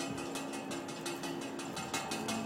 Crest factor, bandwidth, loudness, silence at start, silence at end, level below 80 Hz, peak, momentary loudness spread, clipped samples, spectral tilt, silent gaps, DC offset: 18 dB; 16.5 kHz; -39 LUFS; 0 s; 0 s; -68 dBFS; -22 dBFS; 4 LU; under 0.1%; -3.5 dB/octave; none; under 0.1%